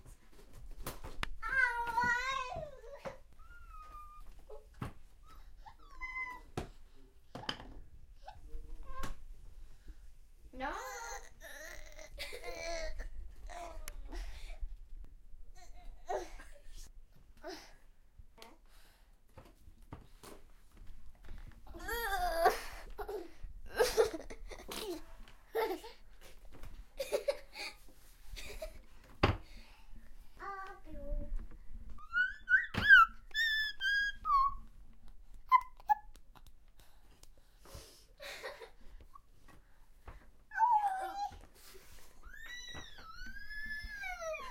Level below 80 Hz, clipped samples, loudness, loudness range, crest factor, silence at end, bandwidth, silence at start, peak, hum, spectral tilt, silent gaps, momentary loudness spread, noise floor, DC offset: -50 dBFS; under 0.1%; -35 LUFS; 22 LU; 28 dB; 0 s; 16.5 kHz; 0.05 s; -12 dBFS; none; -3 dB/octave; none; 25 LU; -61 dBFS; under 0.1%